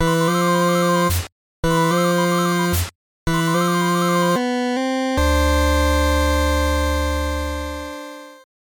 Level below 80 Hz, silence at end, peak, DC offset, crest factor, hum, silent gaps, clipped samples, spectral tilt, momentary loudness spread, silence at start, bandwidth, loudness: -26 dBFS; 0.3 s; -6 dBFS; under 0.1%; 12 dB; none; 1.32-1.63 s, 2.95-3.26 s; under 0.1%; -5 dB/octave; 11 LU; 0 s; 19 kHz; -19 LUFS